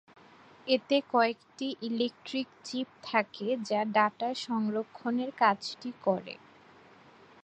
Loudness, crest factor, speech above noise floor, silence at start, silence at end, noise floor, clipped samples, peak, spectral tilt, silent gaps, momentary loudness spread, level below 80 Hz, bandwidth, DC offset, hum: -31 LUFS; 22 dB; 26 dB; 0.65 s; 1.1 s; -57 dBFS; under 0.1%; -10 dBFS; -4.5 dB/octave; none; 10 LU; -80 dBFS; 9.4 kHz; under 0.1%; none